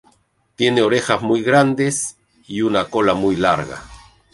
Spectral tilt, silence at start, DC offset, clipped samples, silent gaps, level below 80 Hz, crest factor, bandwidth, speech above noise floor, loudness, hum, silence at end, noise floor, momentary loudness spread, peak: -4.5 dB/octave; 0.6 s; under 0.1%; under 0.1%; none; -50 dBFS; 18 dB; 11.5 kHz; 43 dB; -17 LUFS; none; 0.35 s; -60 dBFS; 11 LU; -2 dBFS